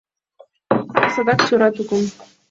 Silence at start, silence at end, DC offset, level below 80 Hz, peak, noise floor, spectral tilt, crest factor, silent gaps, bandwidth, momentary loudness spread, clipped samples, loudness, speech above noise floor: 0.7 s; 0.25 s; under 0.1%; -60 dBFS; -2 dBFS; -52 dBFS; -5 dB/octave; 18 dB; none; 7.8 kHz; 7 LU; under 0.1%; -18 LUFS; 34 dB